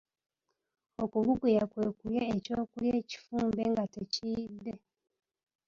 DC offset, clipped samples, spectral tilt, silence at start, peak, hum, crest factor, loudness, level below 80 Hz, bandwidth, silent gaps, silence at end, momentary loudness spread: under 0.1%; under 0.1%; -6.5 dB/octave; 1 s; -16 dBFS; none; 18 dB; -33 LUFS; -62 dBFS; 7.4 kHz; none; 0.9 s; 12 LU